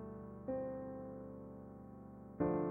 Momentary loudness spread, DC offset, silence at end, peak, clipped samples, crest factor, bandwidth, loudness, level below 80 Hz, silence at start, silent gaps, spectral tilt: 15 LU; under 0.1%; 0 s; -24 dBFS; under 0.1%; 20 dB; 2.8 kHz; -45 LUFS; -64 dBFS; 0 s; none; -12 dB/octave